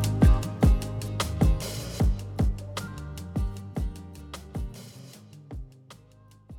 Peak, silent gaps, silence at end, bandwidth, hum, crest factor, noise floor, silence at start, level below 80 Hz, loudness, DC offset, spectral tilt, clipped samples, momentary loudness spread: -8 dBFS; none; 0 s; 16.5 kHz; none; 20 dB; -54 dBFS; 0 s; -30 dBFS; -28 LUFS; under 0.1%; -6.5 dB/octave; under 0.1%; 21 LU